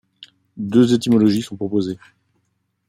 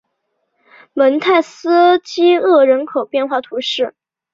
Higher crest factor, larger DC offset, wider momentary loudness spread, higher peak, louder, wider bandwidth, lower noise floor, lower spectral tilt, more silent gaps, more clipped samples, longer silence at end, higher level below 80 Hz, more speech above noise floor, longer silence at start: about the same, 18 dB vs 14 dB; neither; first, 14 LU vs 9 LU; about the same, -2 dBFS vs -2 dBFS; second, -18 LUFS vs -14 LUFS; first, 15 kHz vs 7.6 kHz; about the same, -70 dBFS vs -70 dBFS; first, -6.5 dB/octave vs -3.5 dB/octave; neither; neither; first, 0.95 s vs 0.45 s; about the same, -62 dBFS vs -66 dBFS; second, 52 dB vs 56 dB; second, 0.55 s vs 0.95 s